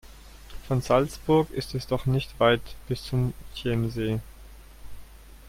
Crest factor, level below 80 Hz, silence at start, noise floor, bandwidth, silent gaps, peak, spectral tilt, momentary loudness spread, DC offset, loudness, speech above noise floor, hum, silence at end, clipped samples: 20 dB; -44 dBFS; 0.05 s; -47 dBFS; 16 kHz; none; -8 dBFS; -6.5 dB/octave; 11 LU; under 0.1%; -27 LUFS; 21 dB; none; 0 s; under 0.1%